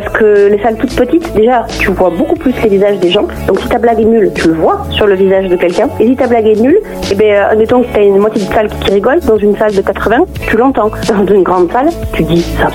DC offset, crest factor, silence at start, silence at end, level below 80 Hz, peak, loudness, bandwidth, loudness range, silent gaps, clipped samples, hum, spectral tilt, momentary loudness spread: under 0.1%; 8 dB; 0 s; 0 s; -28 dBFS; 0 dBFS; -9 LUFS; 17 kHz; 1 LU; none; under 0.1%; none; -6 dB/octave; 4 LU